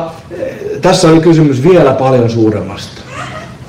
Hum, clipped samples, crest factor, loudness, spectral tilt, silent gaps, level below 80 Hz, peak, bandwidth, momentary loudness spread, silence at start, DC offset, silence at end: none; under 0.1%; 10 dB; -9 LUFS; -6.5 dB/octave; none; -38 dBFS; 0 dBFS; 12.5 kHz; 17 LU; 0 s; under 0.1%; 0 s